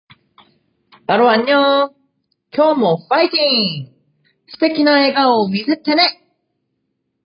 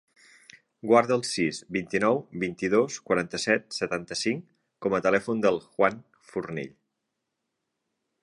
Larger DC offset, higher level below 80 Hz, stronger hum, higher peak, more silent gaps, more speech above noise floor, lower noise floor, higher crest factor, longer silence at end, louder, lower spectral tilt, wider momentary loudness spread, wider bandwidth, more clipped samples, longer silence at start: neither; second, -70 dBFS vs -64 dBFS; neither; first, -2 dBFS vs -6 dBFS; neither; about the same, 57 dB vs 56 dB; second, -71 dBFS vs -82 dBFS; second, 16 dB vs 22 dB; second, 1.15 s vs 1.55 s; first, -14 LUFS vs -27 LUFS; first, -9.5 dB/octave vs -4.5 dB/octave; second, 8 LU vs 13 LU; second, 5.4 kHz vs 11.5 kHz; neither; first, 1.1 s vs 0.85 s